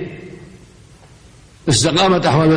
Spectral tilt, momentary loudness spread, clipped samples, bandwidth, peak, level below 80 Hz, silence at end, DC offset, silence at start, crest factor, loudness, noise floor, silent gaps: -4.5 dB/octave; 22 LU; under 0.1%; 10.5 kHz; -4 dBFS; -44 dBFS; 0 s; under 0.1%; 0 s; 14 dB; -14 LUFS; -44 dBFS; none